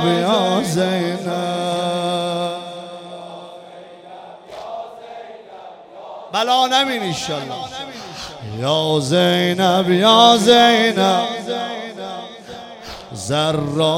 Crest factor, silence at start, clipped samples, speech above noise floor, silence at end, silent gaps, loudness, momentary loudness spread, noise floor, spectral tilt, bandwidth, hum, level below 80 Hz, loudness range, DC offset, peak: 18 dB; 0 s; under 0.1%; 22 dB; 0 s; none; -16 LUFS; 24 LU; -39 dBFS; -4.5 dB/octave; 16.5 kHz; none; -56 dBFS; 17 LU; under 0.1%; 0 dBFS